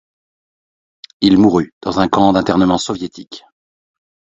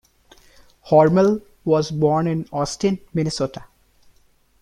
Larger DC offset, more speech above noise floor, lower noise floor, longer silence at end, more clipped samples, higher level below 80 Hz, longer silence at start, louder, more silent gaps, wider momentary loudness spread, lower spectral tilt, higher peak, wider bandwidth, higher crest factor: neither; first, over 76 dB vs 39 dB; first, under -90 dBFS vs -58 dBFS; second, 0.85 s vs 1 s; neither; first, -44 dBFS vs -52 dBFS; first, 1.2 s vs 0.85 s; first, -14 LUFS vs -20 LUFS; first, 1.72-1.81 s vs none; first, 16 LU vs 11 LU; about the same, -6 dB/octave vs -6.5 dB/octave; about the same, 0 dBFS vs -2 dBFS; second, 8 kHz vs 11.5 kHz; about the same, 16 dB vs 18 dB